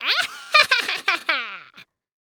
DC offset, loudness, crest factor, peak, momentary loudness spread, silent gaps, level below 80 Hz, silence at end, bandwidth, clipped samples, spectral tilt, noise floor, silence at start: under 0.1%; -19 LUFS; 22 dB; 0 dBFS; 14 LU; none; -74 dBFS; 0.4 s; over 20 kHz; under 0.1%; 1 dB/octave; -50 dBFS; 0 s